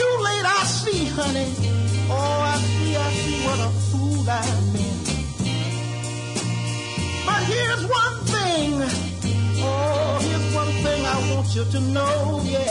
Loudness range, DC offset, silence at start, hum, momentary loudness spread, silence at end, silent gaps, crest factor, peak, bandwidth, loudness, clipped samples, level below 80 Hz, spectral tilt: 3 LU; under 0.1%; 0 s; none; 5 LU; 0 s; none; 12 dB; -10 dBFS; 11 kHz; -22 LUFS; under 0.1%; -42 dBFS; -4.5 dB/octave